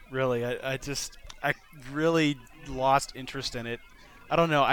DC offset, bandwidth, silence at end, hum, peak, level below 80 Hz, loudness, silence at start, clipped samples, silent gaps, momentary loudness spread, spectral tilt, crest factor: under 0.1%; 18.5 kHz; 0 s; none; -8 dBFS; -50 dBFS; -29 LUFS; 0 s; under 0.1%; none; 13 LU; -4.5 dB/octave; 20 dB